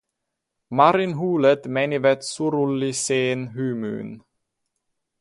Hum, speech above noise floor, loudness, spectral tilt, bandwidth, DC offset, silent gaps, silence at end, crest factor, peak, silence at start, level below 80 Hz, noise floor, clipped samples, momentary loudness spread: none; 59 dB; -21 LUFS; -5 dB/octave; 11.5 kHz; under 0.1%; none; 1 s; 20 dB; -2 dBFS; 0.7 s; -66 dBFS; -81 dBFS; under 0.1%; 11 LU